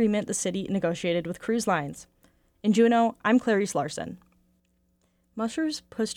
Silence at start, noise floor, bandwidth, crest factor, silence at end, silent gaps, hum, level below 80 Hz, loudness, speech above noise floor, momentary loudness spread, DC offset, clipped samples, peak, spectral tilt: 0 s; -69 dBFS; 15 kHz; 18 dB; 0.05 s; none; none; -62 dBFS; -26 LUFS; 43 dB; 13 LU; under 0.1%; under 0.1%; -10 dBFS; -5 dB/octave